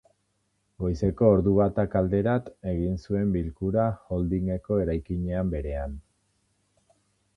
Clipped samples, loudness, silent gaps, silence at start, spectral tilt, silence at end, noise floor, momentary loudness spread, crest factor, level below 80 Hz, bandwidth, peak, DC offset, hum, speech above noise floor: under 0.1%; -26 LUFS; none; 0.8 s; -10 dB/octave; 1.35 s; -73 dBFS; 11 LU; 20 dB; -40 dBFS; 6.6 kHz; -6 dBFS; under 0.1%; none; 48 dB